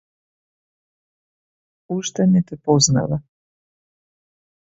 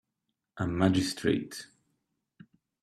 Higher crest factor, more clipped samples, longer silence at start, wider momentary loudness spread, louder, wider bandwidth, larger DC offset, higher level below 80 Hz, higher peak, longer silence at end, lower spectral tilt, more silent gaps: about the same, 20 dB vs 22 dB; neither; first, 1.9 s vs 0.55 s; second, 12 LU vs 15 LU; first, -19 LUFS vs -29 LUFS; second, 8 kHz vs 14 kHz; neither; first, -54 dBFS vs -60 dBFS; first, -2 dBFS vs -10 dBFS; first, 1.55 s vs 1.2 s; about the same, -5 dB/octave vs -5.5 dB/octave; neither